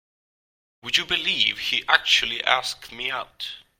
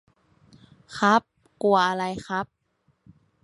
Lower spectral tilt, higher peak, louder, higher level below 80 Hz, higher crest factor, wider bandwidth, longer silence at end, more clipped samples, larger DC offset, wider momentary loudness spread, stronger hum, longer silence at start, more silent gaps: second, 0 dB/octave vs -5 dB/octave; first, 0 dBFS vs -6 dBFS; first, -21 LUFS vs -24 LUFS; first, -58 dBFS vs -64 dBFS; about the same, 26 dB vs 22 dB; first, 16.5 kHz vs 11.5 kHz; second, 0.2 s vs 1 s; neither; neither; about the same, 13 LU vs 12 LU; neither; about the same, 0.85 s vs 0.9 s; neither